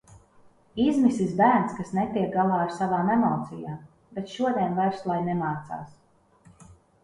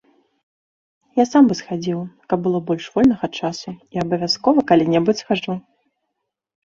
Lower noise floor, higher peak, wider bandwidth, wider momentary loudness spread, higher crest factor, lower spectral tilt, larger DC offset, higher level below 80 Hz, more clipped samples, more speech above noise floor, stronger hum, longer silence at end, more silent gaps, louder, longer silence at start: second, -57 dBFS vs -78 dBFS; second, -8 dBFS vs -2 dBFS; first, 11 kHz vs 7.6 kHz; first, 17 LU vs 12 LU; about the same, 20 dB vs 18 dB; first, -7.5 dB/octave vs -6 dB/octave; neither; about the same, -60 dBFS vs -56 dBFS; neither; second, 32 dB vs 60 dB; neither; second, 0.3 s vs 1.05 s; neither; second, -25 LUFS vs -19 LUFS; second, 0.1 s vs 1.15 s